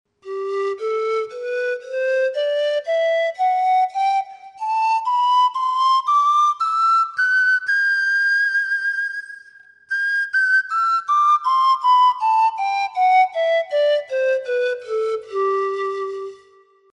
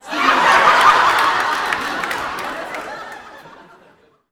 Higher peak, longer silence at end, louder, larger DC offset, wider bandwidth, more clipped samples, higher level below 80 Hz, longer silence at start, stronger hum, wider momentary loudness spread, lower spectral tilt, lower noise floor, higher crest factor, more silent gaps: second, -8 dBFS vs 0 dBFS; second, 0.6 s vs 0.85 s; second, -18 LUFS vs -14 LUFS; neither; second, 11 kHz vs 19.5 kHz; neither; second, -78 dBFS vs -52 dBFS; first, 0.25 s vs 0.05 s; neither; second, 9 LU vs 19 LU; about the same, -0.5 dB/octave vs -1.5 dB/octave; about the same, -53 dBFS vs -52 dBFS; second, 12 dB vs 18 dB; neither